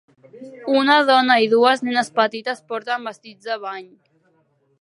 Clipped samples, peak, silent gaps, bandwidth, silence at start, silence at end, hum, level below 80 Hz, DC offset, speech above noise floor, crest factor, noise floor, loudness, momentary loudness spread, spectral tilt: under 0.1%; -2 dBFS; none; 11.5 kHz; 0.35 s; 0.95 s; none; -80 dBFS; under 0.1%; 44 dB; 18 dB; -63 dBFS; -18 LUFS; 18 LU; -3.5 dB/octave